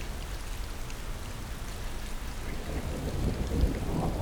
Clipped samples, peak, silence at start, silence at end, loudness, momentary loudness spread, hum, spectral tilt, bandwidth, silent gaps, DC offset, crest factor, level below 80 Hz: under 0.1%; -14 dBFS; 0 s; 0 s; -36 LUFS; 9 LU; none; -5.5 dB/octave; over 20 kHz; none; under 0.1%; 18 dB; -34 dBFS